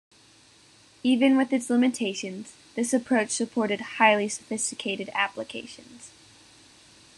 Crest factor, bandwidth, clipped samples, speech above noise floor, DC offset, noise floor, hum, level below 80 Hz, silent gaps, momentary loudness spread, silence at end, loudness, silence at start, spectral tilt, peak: 22 dB; 12.5 kHz; under 0.1%; 31 dB; under 0.1%; -56 dBFS; none; -74 dBFS; none; 17 LU; 1.1 s; -25 LUFS; 1.05 s; -3 dB/octave; -4 dBFS